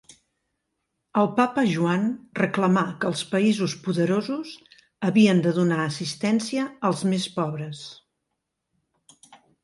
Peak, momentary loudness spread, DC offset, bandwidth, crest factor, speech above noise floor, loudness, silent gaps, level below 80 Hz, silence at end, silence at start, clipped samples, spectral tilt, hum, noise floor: -6 dBFS; 10 LU; under 0.1%; 11.5 kHz; 18 dB; 57 dB; -24 LUFS; none; -68 dBFS; 0.3 s; 1.15 s; under 0.1%; -6 dB/octave; none; -80 dBFS